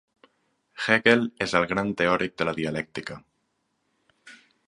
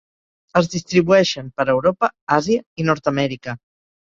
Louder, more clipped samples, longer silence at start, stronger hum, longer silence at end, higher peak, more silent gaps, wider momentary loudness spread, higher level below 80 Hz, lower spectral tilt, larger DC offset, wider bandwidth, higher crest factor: second, -24 LUFS vs -19 LUFS; neither; first, 0.75 s vs 0.55 s; neither; second, 0.35 s vs 0.55 s; about the same, -2 dBFS vs -2 dBFS; second, none vs 2.21-2.27 s, 2.66-2.76 s; first, 15 LU vs 8 LU; about the same, -58 dBFS vs -54 dBFS; about the same, -5 dB/octave vs -5.5 dB/octave; neither; first, 11 kHz vs 7.6 kHz; first, 26 dB vs 18 dB